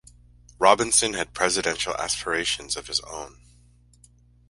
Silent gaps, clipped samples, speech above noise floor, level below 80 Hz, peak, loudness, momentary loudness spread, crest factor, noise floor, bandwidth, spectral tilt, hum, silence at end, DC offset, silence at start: none; under 0.1%; 32 dB; -52 dBFS; -2 dBFS; -23 LUFS; 10 LU; 24 dB; -56 dBFS; 11.5 kHz; -1 dB/octave; 60 Hz at -50 dBFS; 1.2 s; under 0.1%; 0.6 s